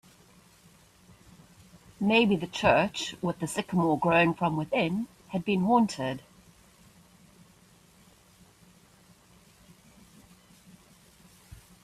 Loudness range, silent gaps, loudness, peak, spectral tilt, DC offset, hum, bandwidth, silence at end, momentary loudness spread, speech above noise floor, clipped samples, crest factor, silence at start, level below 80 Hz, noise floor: 6 LU; none; -27 LUFS; -8 dBFS; -5.5 dB/octave; under 0.1%; none; 14 kHz; 5.65 s; 11 LU; 33 dB; under 0.1%; 24 dB; 2 s; -60 dBFS; -59 dBFS